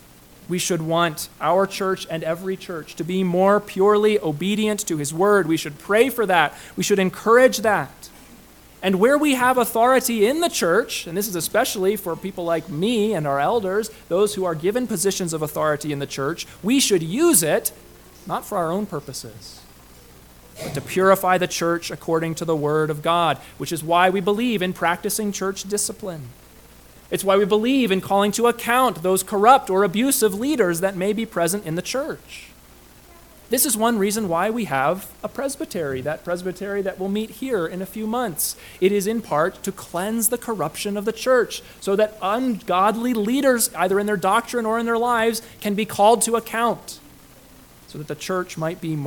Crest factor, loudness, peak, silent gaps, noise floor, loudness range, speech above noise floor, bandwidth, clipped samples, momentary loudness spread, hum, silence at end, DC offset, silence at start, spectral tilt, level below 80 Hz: 20 dB; -21 LUFS; -2 dBFS; none; -48 dBFS; 5 LU; 27 dB; 19 kHz; under 0.1%; 11 LU; none; 0 s; under 0.1%; 0.4 s; -4 dB/octave; -54 dBFS